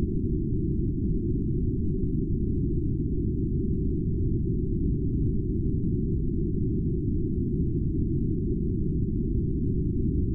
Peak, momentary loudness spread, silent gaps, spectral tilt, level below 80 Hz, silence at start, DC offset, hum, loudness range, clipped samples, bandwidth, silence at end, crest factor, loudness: -16 dBFS; 1 LU; none; -16 dB/octave; -30 dBFS; 0 s; under 0.1%; none; 0 LU; under 0.1%; 0.5 kHz; 0 s; 10 dB; -28 LUFS